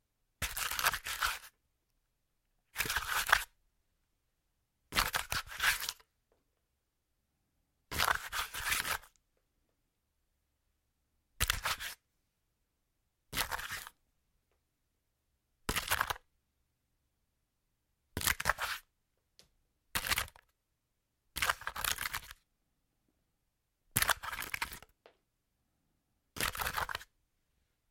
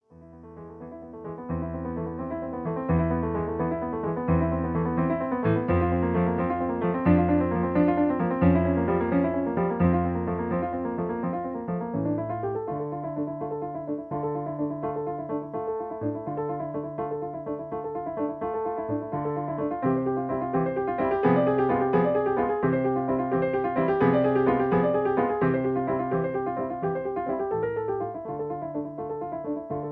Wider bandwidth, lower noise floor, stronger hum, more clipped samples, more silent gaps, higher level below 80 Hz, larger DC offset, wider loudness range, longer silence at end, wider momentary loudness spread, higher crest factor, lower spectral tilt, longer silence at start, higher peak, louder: first, 17 kHz vs 4.1 kHz; first, -83 dBFS vs -48 dBFS; neither; neither; neither; second, -56 dBFS vs -48 dBFS; neither; about the same, 6 LU vs 7 LU; first, 0.85 s vs 0 s; first, 13 LU vs 10 LU; first, 34 dB vs 18 dB; second, -0.5 dB/octave vs -12 dB/octave; first, 0.4 s vs 0.1 s; about the same, -6 dBFS vs -8 dBFS; second, -35 LUFS vs -27 LUFS